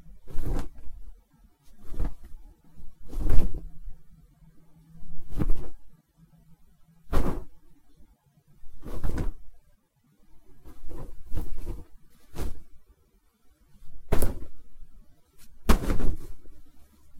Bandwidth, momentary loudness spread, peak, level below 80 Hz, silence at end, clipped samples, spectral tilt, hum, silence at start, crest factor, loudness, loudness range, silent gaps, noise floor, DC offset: 15 kHz; 26 LU; -2 dBFS; -32 dBFS; 0 s; under 0.1%; -6 dB/octave; none; 0.1 s; 22 dB; -35 LUFS; 10 LU; none; -64 dBFS; under 0.1%